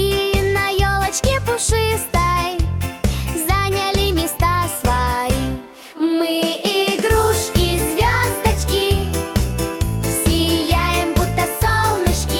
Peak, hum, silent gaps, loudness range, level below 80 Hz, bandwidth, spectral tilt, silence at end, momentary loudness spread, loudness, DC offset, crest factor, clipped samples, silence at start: -4 dBFS; none; none; 1 LU; -26 dBFS; 18 kHz; -4.5 dB/octave; 0 s; 5 LU; -18 LUFS; under 0.1%; 14 dB; under 0.1%; 0 s